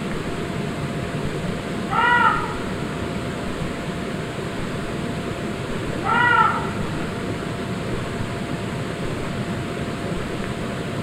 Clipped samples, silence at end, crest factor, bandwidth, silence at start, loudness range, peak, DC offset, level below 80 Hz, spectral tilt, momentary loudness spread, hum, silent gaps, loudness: under 0.1%; 0 s; 20 dB; 16 kHz; 0 s; 5 LU; -4 dBFS; under 0.1%; -40 dBFS; -5.5 dB/octave; 10 LU; none; none; -24 LUFS